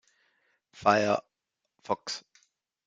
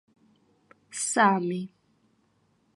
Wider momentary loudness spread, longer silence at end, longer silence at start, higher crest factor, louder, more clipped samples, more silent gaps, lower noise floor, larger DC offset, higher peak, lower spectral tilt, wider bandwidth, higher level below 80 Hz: second, 13 LU vs 18 LU; second, 0.65 s vs 1.1 s; second, 0.75 s vs 0.9 s; about the same, 24 dB vs 22 dB; second, -29 LUFS vs -25 LUFS; neither; neither; first, -85 dBFS vs -68 dBFS; neither; about the same, -8 dBFS vs -8 dBFS; about the same, -4 dB/octave vs -4 dB/octave; second, 9.4 kHz vs 11.5 kHz; first, -72 dBFS vs -82 dBFS